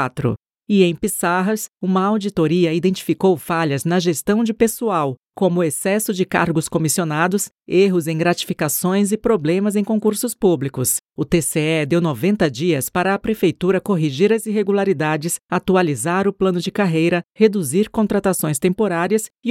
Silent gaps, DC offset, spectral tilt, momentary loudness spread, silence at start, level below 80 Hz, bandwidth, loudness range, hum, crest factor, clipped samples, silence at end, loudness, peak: 11.01-11.05 s, 17.25-17.29 s; under 0.1%; -5 dB/octave; 3 LU; 0 s; -50 dBFS; 17 kHz; 1 LU; none; 18 dB; under 0.1%; 0 s; -18 LUFS; 0 dBFS